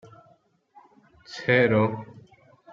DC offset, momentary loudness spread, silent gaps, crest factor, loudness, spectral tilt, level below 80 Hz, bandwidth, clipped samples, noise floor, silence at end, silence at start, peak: under 0.1%; 22 LU; none; 22 dB; -22 LUFS; -7 dB/octave; -64 dBFS; 7.4 kHz; under 0.1%; -62 dBFS; 0.7 s; 1.3 s; -6 dBFS